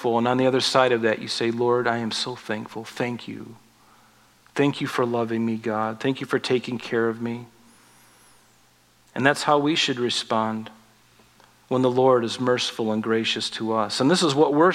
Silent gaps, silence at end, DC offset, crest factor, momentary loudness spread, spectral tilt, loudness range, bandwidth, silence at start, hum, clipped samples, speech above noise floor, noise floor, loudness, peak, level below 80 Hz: none; 0 s; under 0.1%; 22 dB; 12 LU; -4.5 dB/octave; 5 LU; 15 kHz; 0 s; none; under 0.1%; 36 dB; -58 dBFS; -23 LUFS; -2 dBFS; -70 dBFS